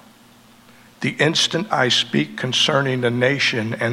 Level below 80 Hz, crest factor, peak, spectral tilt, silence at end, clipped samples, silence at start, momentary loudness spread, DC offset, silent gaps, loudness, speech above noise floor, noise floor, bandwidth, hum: -64 dBFS; 18 dB; -2 dBFS; -3.5 dB/octave; 0 s; under 0.1%; 1 s; 5 LU; under 0.1%; none; -18 LUFS; 30 dB; -49 dBFS; 15.5 kHz; none